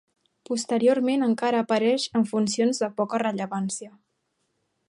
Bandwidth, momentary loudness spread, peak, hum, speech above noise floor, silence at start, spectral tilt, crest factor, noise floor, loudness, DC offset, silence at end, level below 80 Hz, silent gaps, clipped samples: 11.5 kHz; 8 LU; -10 dBFS; none; 51 dB; 0.5 s; -4.5 dB/octave; 16 dB; -75 dBFS; -24 LUFS; under 0.1%; 1 s; -72 dBFS; none; under 0.1%